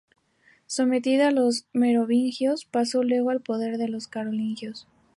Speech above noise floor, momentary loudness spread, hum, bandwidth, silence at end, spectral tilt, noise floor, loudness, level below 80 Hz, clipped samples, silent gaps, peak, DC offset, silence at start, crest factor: 38 dB; 10 LU; none; 11.5 kHz; 0.35 s; -4.5 dB/octave; -62 dBFS; -24 LUFS; -76 dBFS; under 0.1%; none; -10 dBFS; under 0.1%; 0.7 s; 14 dB